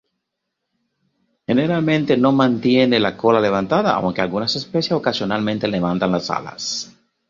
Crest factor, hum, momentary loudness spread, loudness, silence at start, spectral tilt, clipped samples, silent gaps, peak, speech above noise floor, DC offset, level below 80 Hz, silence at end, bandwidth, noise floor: 18 dB; none; 9 LU; -18 LUFS; 1.5 s; -5.5 dB/octave; under 0.1%; none; -2 dBFS; 60 dB; under 0.1%; -54 dBFS; 0.45 s; 7.6 kHz; -78 dBFS